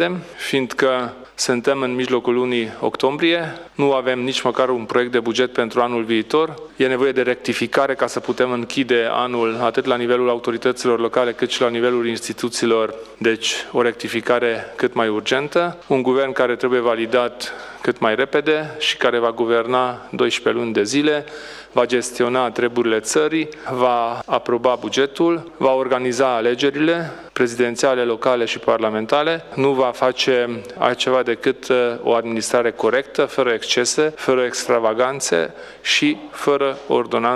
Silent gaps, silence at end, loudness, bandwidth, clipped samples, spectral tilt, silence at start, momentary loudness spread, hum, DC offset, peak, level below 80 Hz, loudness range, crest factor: none; 0 s; -19 LUFS; 13.5 kHz; under 0.1%; -3.5 dB/octave; 0 s; 4 LU; none; under 0.1%; 0 dBFS; -60 dBFS; 1 LU; 18 dB